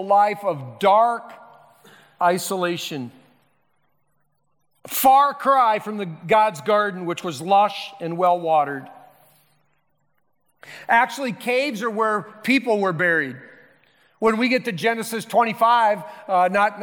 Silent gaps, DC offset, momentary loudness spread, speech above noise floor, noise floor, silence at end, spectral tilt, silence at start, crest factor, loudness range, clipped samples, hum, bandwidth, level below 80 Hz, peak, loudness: none; under 0.1%; 11 LU; 51 dB; -71 dBFS; 0 s; -4.5 dB/octave; 0 s; 16 dB; 6 LU; under 0.1%; none; 19 kHz; -68 dBFS; -6 dBFS; -20 LUFS